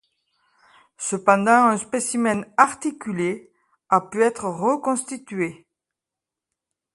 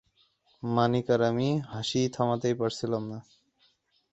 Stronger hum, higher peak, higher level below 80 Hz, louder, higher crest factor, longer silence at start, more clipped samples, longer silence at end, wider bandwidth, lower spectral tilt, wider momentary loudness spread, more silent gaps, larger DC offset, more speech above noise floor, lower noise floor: neither; first, 0 dBFS vs -10 dBFS; about the same, -68 dBFS vs -64 dBFS; first, -21 LUFS vs -28 LUFS; about the same, 22 dB vs 20 dB; first, 1 s vs 0.65 s; neither; first, 1.4 s vs 0.9 s; first, 11.5 kHz vs 8.2 kHz; second, -4.5 dB/octave vs -6 dB/octave; first, 12 LU vs 9 LU; neither; neither; first, 66 dB vs 41 dB; first, -87 dBFS vs -69 dBFS